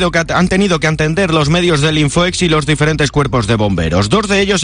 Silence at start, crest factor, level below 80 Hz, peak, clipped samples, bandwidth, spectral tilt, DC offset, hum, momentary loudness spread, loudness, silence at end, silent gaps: 0 s; 10 dB; -30 dBFS; -2 dBFS; under 0.1%; 10.5 kHz; -5 dB/octave; under 0.1%; none; 2 LU; -13 LUFS; 0 s; none